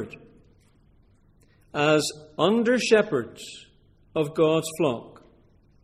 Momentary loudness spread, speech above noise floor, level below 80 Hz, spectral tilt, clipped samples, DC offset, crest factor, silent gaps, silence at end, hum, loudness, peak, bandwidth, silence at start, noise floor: 18 LU; 35 dB; -62 dBFS; -4.5 dB/octave; under 0.1%; under 0.1%; 20 dB; none; 0.75 s; none; -24 LUFS; -6 dBFS; 14.5 kHz; 0 s; -59 dBFS